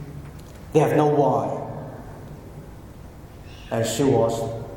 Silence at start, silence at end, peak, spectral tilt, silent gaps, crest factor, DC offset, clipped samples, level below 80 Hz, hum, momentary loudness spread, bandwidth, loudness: 0 s; 0 s; -4 dBFS; -6 dB/octave; none; 20 dB; under 0.1%; under 0.1%; -46 dBFS; none; 23 LU; 17.5 kHz; -22 LUFS